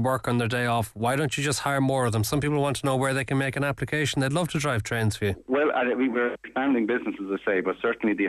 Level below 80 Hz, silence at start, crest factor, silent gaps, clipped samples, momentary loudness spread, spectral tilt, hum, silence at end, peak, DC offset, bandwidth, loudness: -54 dBFS; 0 s; 14 dB; none; under 0.1%; 3 LU; -5.5 dB/octave; none; 0 s; -12 dBFS; under 0.1%; 14.5 kHz; -25 LUFS